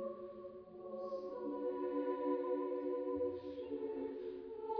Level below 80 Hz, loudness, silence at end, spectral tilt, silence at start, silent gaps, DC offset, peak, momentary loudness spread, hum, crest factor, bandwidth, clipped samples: -76 dBFS; -42 LUFS; 0 s; -6 dB/octave; 0 s; none; under 0.1%; -26 dBFS; 11 LU; none; 16 dB; 5.4 kHz; under 0.1%